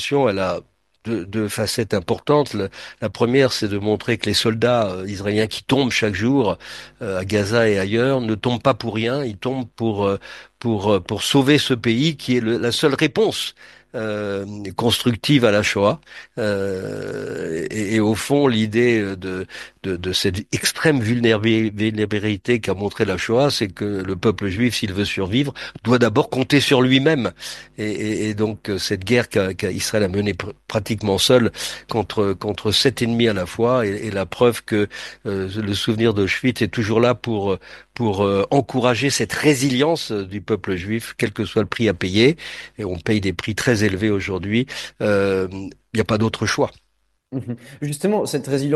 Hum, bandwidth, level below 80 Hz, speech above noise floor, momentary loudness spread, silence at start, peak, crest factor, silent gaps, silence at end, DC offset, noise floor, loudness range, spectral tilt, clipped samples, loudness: none; 12.5 kHz; -50 dBFS; 48 dB; 11 LU; 0 s; 0 dBFS; 20 dB; none; 0 s; under 0.1%; -68 dBFS; 3 LU; -5 dB/octave; under 0.1%; -20 LUFS